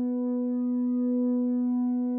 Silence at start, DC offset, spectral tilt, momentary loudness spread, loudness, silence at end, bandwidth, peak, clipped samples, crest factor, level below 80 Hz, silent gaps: 0 s; under 0.1%; -11.5 dB/octave; 2 LU; -27 LUFS; 0 s; 1.8 kHz; -20 dBFS; under 0.1%; 6 dB; under -90 dBFS; none